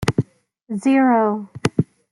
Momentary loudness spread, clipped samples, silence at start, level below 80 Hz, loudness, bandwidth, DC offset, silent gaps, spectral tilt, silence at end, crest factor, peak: 12 LU; under 0.1%; 0 s; -50 dBFS; -19 LUFS; 12 kHz; under 0.1%; none; -7 dB/octave; 0.3 s; 18 dB; -2 dBFS